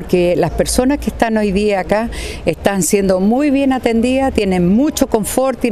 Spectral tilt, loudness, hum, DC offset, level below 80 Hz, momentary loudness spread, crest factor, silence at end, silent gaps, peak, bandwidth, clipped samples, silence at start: -5 dB/octave; -15 LUFS; none; under 0.1%; -30 dBFS; 4 LU; 14 dB; 0 s; none; 0 dBFS; 14 kHz; under 0.1%; 0 s